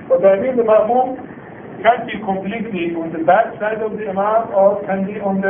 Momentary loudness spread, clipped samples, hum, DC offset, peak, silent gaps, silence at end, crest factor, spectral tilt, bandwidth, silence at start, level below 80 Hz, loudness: 9 LU; under 0.1%; none; under 0.1%; 0 dBFS; none; 0 s; 16 dB; -11.5 dB/octave; 3.7 kHz; 0 s; -54 dBFS; -17 LUFS